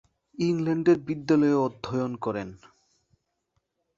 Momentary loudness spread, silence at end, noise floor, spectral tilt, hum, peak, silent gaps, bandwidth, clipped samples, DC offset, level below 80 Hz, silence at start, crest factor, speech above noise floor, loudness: 10 LU; 1.4 s; -76 dBFS; -7.5 dB/octave; none; -10 dBFS; none; 7.6 kHz; under 0.1%; under 0.1%; -62 dBFS; 0.4 s; 18 dB; 51 dB; -26 LUFS